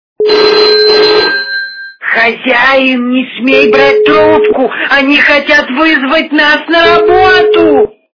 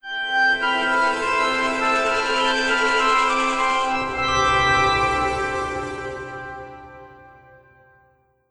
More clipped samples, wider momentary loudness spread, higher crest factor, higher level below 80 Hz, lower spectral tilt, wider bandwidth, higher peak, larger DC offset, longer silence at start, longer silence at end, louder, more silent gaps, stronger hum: first, 2% vs under 0.1%; second, 6 LU vs 14 LU; second, 8 dB vs 14 dB; about the same, -42 dBFS vs -44 dBFS; first, -4.5 dB/octave vs -3 dB/octave; second, 5.4 kHz vs 11 kHz; first, 0 dBFS vs -6 dBFS; neither; first, 0.2 s vs 0.05 s; second, 0.25 s vs 1.2 s; first, -7 LUFS vs -19 LUFS; neither; neither